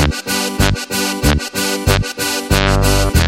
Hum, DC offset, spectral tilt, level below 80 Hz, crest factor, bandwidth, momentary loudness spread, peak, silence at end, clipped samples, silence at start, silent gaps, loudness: none; under 0.1%; -4 dB/octave; -22 dBFS; 14 dB; 16.5 kHz; 5 LU; 0 dBFS; 0 s; under 0.1%; 0 s; none; -15 LUFS